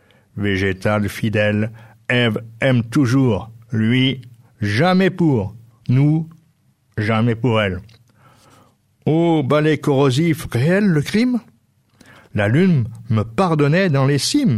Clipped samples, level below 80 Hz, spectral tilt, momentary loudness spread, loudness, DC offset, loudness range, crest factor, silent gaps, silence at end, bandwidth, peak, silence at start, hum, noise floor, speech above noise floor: under 0.1%; -50 dBFS; -6.5 dB/octave; 10 LU; -18 LUFS; under 0.1%; 3 LU; 14 dB; none; 0 s; 14.5 kHz; -4 dBFS; 0.35 s; none; -59 dBFS; 43 dB